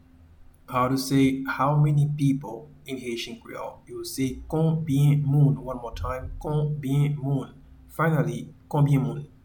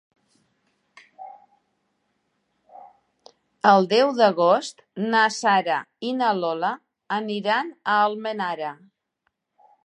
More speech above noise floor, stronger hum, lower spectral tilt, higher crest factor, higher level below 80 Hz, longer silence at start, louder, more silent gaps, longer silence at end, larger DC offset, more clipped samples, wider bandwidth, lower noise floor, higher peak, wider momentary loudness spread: second, 27 dB vs 54 dB; neither; first, -7 dB/octave vs -4.5 dB/octave; second, 16 dB vs 22 dB; first, -46 dBFS vs -82 dBFS; second, 0.4 s vs 1.2 s; second, -25 LUFS vs -22 LUFS; neither; second, 0.2 s vs 1.1 s; neither; neither; first, 19 kHz vs 10.5 kHz; second, -51 dBFS vs -75 dBFS; second, -10 dBFS vs -2 dBFS; about the same, 16 LU vs 17 LU